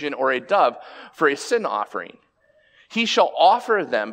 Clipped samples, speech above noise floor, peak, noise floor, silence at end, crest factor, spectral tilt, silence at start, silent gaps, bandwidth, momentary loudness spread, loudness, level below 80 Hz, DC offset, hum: under 0.1%; 39 dB; -4 dBFS; -60 dBFS; 0 s; 18 dB; -3 dB/octave; 0 s; none; 16 kHz; 16 LU; -20 LUFS; -76 dBFS; under 0.1%; none